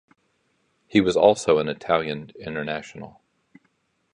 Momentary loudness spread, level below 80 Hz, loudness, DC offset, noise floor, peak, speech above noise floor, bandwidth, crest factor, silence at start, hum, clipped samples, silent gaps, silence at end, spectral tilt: 20 LU; -58 dBFS; -22 LUFS; under 0.1%; -69 dBFS; -2 dBFS; 47 dB; 11 kHz; 22 dB; 0.95 s; none; under 0.1%; none; 1.05 s; -5 dB/octave